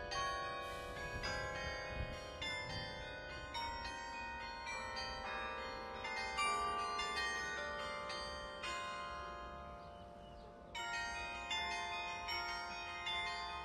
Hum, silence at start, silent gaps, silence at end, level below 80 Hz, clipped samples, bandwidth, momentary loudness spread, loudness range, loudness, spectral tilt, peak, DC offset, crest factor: none; 0 s; none; 0 s; -58 dBFS; under 0.1%; 14 kHz; 9 LU; 5 LU; -43 LUFS; -2.5 dB/octave; -26 dBFS; under 0.1%; 18 dB